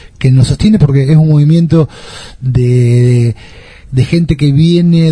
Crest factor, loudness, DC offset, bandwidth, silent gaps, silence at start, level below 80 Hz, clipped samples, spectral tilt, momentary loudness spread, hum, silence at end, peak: 8 dB; -9 LUFS; under 0.1%; 10.5 kHz; none; 0.05 s; -30 dBFS; 0.7%; -8 dB/octave; 10 LU; none; 0 s; 0 dBFS